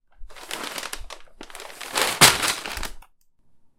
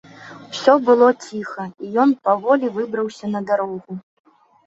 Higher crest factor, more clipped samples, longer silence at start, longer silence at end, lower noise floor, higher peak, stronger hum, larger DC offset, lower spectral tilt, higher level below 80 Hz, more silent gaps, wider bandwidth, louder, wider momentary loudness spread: first, 26 dB vs 18 dB; neither; about the same, 0.2 s vs 0.2 s; about the same, 0.75 s vs 0.65 s; first, -56 dBFS vs -39 dBFS; about the same, 0 dBFS vs -2 dBFS; neither; neither; second, -1 dB/octave vs -5.5 dB/octave; first, -44 dBFS vs -70 dBFS; neither; first, 17 kHz vs 8 kHz; about the same, -20 LUFS vs -18 LUFS; first, 26 LU vs 18 LU